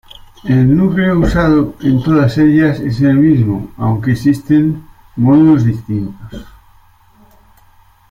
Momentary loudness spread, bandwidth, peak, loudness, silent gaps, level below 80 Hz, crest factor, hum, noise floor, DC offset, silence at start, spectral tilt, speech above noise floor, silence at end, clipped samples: 15 LU; 14.5 kHz; 0 dBFS; -12 LUFS; none; -32 dBFS; 12 dB; none; -47 dBFS; under 0.1%; 0.45 s; -9 dB/octave; 35 dB; 1.6 s; under 0.1%